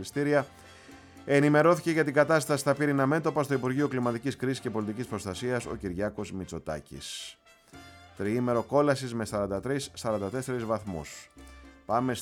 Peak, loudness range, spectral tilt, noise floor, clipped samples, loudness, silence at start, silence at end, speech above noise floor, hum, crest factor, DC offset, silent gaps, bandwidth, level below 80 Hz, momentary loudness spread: -10 dBFS; 9 LU; -6 dB/octave; -52 dBFS; under 0.1%; -29 LUFS; 0 s; 0 s; 24 dB; none; 20 dB; under 0.1%; none; 17.5 kHz; -58 dBFS; 14 LU